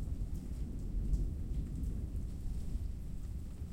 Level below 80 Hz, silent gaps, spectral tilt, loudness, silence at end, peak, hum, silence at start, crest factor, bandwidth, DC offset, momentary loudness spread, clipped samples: -40 dBFS; none; -8 dB/octave; -42 LUFS; 0 s; -24 dBFS; none; 0 s; 14 dB; 15.5 kHz; under 0.1%; 7 LU; under 0.1%